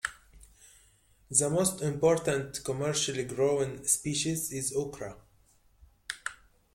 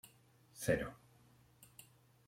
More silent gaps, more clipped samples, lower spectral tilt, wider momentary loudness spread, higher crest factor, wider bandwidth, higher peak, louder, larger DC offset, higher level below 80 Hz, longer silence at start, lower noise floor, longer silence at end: neither; neither; second, -3.5 dB/octave vs -5 dB/octave; second, 13 LU vs 25 LU; about the same, 24 dB vs 24 dB; about the same, 16.5 kHz vs 16.5 kHz; first, -8 dBFS vs -20 dBFS; first, -29 LUFS vs -39 LUFS; neither; about the same, -60 dBFS vs -64 dBFS; about the same, 0.05 s vs 0.05 s; second, -64 dBFS vs -68 dBFS; about the same, 0.4 s vs 0.45 s